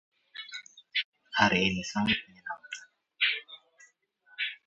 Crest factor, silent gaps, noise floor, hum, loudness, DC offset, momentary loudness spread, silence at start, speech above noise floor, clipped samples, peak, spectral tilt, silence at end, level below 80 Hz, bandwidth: 26 dB; 1.04-1.12 s; -64 dBFS; none; -29 LUFS; under 0.1%; 20 LU; 0.35 s; 36 dB; under 0.1%; -6 dBFS; -3.5 dB/octave; 0.1 s; -62 dBFS; 8 kHz